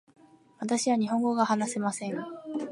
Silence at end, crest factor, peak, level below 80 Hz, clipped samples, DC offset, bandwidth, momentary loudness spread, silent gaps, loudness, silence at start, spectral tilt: 0 s; 18 dB; -10 dBFS; -80 dBFS; under 0.1%; under 0.1%; 11.5 kHz; 11 LU; none; -29 LUFS; 0.6 s; -4.5 dB/octave